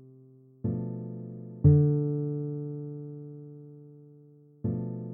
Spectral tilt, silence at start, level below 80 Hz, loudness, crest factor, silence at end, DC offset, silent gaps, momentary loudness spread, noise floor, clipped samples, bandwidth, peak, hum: -15.5 dB/octave; 0 s; -52 dBFS; -29 LUFS; 22 dB; 0 s; under 0.1%; none; 23 LU; -55 dBFS; under 0.1%; 1.7 kHz; -8 dBFS; none